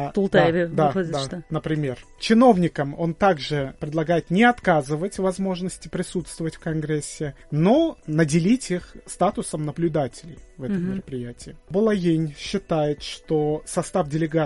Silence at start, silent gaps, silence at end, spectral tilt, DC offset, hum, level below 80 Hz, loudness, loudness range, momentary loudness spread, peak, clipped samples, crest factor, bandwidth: 0 s; none; 0 s; -6 dB/octave; under 0.1%; none; -48 dBFS; -23 LUFS; 5 LU; 12 LU; -2 dBFS; under 0.1%; 20 dB; 11.5 kHz